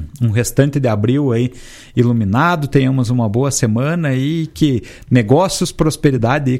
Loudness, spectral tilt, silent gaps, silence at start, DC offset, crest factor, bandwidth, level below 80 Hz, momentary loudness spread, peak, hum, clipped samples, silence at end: -15 LUFS; -6 dB/octave; none; 0 s; under 0.1%; 14 dB; 14 kHz; -38 dBFS; 4 LU; 0 dBFS; none; under 0.1%; 0 s